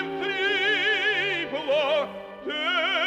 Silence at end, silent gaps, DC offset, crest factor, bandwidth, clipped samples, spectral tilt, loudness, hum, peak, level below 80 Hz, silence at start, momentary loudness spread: 0 s; none; under 0.1%; 12 dB; 14.5 kHz; under 0.1%; -3 dB/octave; -24 LUFS; 50 Hz at -65 dBFS; -14 dBFS; -66 dBFS; 0 s; 8 LU